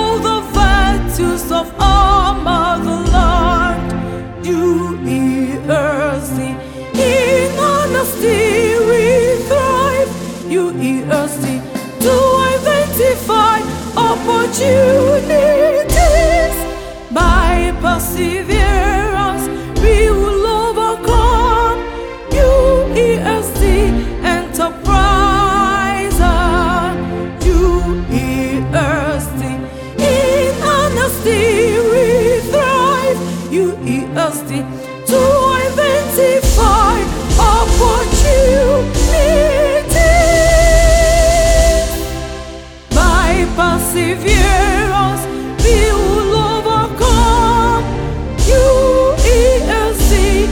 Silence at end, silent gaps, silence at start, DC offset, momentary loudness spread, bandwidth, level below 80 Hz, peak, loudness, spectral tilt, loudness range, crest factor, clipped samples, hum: 0 s; none; 0 s; under 0.1%; 9 LU; 19 kHz; -18 dBFS; 0 dBFS; -13 LUFS; -5 dB/octave; 4 LU; 12 dB; under 0.1%; none